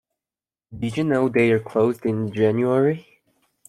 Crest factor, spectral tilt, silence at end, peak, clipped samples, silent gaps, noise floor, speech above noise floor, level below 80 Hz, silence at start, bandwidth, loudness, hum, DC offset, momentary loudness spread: 16 dB; -8 dB/octave; 0.65 s; -6 dBFS; under 0.1%; none; under -90 dBFS; over 70 dB; -60 dBFS; 0.7 s; 13 kHz; -21 LUFS; none; under 0.1%; 8 LU